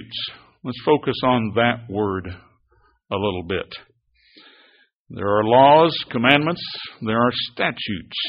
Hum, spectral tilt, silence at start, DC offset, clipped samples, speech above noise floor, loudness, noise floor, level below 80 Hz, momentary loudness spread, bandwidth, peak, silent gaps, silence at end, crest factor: none; -3 dB/octave; 0 s; under 0.1%; under 0.1%; 41 dB; -20 LUFS; -61 dBFS; -54 dBFS; 17 LU; 5.4 kHz; 0 dBFS; 4.93-5.05 s; 0 s; 22 dB